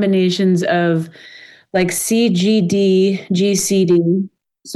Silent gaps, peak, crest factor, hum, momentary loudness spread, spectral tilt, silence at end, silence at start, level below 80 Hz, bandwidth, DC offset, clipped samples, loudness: none; -6 dBFS; 10 dB; none; 7 LU; -5 dB/octave; 0 s; 0 s; -58 dBFS; 13 kHz; under 0.1%; under 0.1%; -15 LUFS